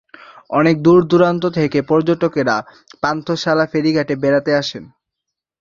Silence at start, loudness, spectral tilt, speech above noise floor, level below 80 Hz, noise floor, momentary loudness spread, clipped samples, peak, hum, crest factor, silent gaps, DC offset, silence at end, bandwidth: 0.5 s; -16 LUFS; -6.5 dB/octave; 65 dB; -54 dBFS; -80 dBFS; 9 LU; under 0.1%; -2 dBFS; none; 16 dB; none; under 0.1%; 0.75 s; 7.4 kHz